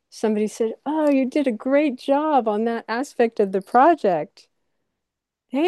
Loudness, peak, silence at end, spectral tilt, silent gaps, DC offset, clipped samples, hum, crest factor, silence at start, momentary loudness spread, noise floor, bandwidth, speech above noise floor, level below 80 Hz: -21 LUFS; -6 dBFS; 0 s; -6 dB/octave; none; under 0.1%; under 0.1%; none; 16 dB; 0.15 s; 9 LU; -83 dBFS; 12.5 kHz; 63 dB; -74 dBFS